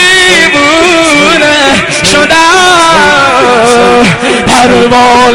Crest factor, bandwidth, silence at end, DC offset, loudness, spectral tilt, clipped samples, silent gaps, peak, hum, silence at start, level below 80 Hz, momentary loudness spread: 4 dB; over 20 kHz; 0 s; under 0.1%; -4 LUFS; -3 dB/octave; 5%; none; 0 dBFS; none; 0 s; -32 dBFS; 3 LU